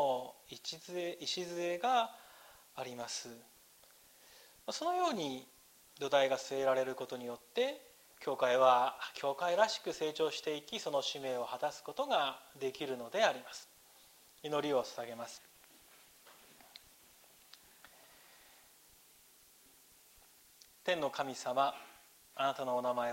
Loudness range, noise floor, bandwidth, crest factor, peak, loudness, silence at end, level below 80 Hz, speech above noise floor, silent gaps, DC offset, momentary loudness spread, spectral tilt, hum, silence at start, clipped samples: 9 LU; -64 dBFS; 16 kHz; 22 dB; -16 dBFS; -36 LUFS; 0 s; -82 dBFS; 28 dB; none; under 0.1%; 19 LU; -3 dB/octave; none; 0 s; under 0.1%